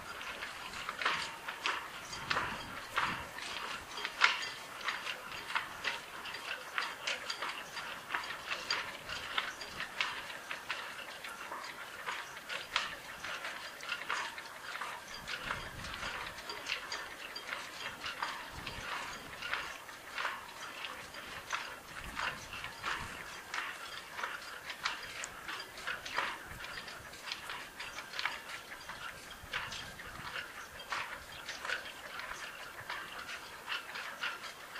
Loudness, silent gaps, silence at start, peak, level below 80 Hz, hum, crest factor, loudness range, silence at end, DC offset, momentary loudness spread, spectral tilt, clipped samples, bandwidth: -40 LUFS; none; 0 s; -8 dBFS; -64 dBFS; none; 32 dB; 6 LU; 0 s; under 0.1%; 8 LU; -1 dB/octave; under 0.1%; 15.5 kHz